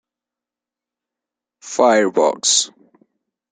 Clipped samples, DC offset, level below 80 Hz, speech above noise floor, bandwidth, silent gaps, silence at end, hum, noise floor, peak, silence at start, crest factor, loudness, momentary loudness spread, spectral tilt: under 0.1%; under 0.1%; -70 dBFS; 72 dB; 9.6 kHz; none; 0.85 s; none; -88 dBFS; 0 dBFS; 1.65 s; 20 dB; -16 LUFS; 11 LU; -1 dB/octave